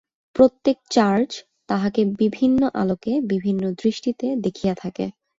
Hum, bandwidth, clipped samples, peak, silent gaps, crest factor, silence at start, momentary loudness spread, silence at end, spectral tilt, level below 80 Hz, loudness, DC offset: none; 7.8 kHz; under 0.1%; -4 dBFS; none; 18 dB; 0.35 s; 10 LU; 0.3 s; -6.5 dB/octave; -56 dBFS; -21 LUFS; under 0.1%